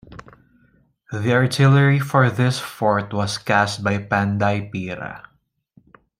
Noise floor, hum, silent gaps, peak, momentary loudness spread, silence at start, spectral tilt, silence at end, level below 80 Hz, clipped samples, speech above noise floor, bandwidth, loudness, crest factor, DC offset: -59 dBFS; none; none; -2 dBFS; 14 LU; 0.1 s; -6 dB/octave; 1 s; -56 dBFS; under 0.1%; 40 dB; 15 kHz; -19 LUFS; 18 dB; under 0.1%